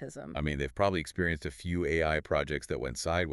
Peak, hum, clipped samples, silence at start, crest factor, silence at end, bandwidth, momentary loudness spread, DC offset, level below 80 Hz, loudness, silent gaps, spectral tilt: -12 dBFS; none; under 0.1%; 0 s; 20 dB; 0 s; 12 kHz; 7 LU; under 0.1%; -46 dBFS; -32 LUFS; none; -5.5 dB/octave